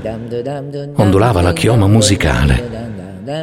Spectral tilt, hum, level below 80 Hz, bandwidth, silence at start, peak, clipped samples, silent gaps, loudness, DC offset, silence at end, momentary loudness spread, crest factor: -5.5 dB/octave; none; -26 dBFS; 15.5 kHz; 0 s; 0 dBFS; under 0.1%; none; -13 LUFS; under 0.1%; 0 s; 14 LU; 14 dB